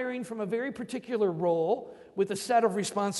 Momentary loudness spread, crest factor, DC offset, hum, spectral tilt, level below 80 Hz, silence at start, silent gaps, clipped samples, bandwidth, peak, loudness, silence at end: 9 LU; 16 dB; under 0.1%; none; -5 dB/octave; -72 dBFS; 0 s; none; under 0.1%; 11.5 kHz; -12 dBFS; -30 LUFS; 0 s